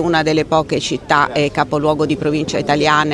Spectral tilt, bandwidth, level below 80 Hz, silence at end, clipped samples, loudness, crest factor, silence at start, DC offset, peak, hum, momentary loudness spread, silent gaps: -5 dB/octave; 12 kHz; -42 dBFS; 0 s; under 0.1%; -16 LUFS; 16 dB; 0 s; under 0.1%; 0 dBFS; none; 4 LU; none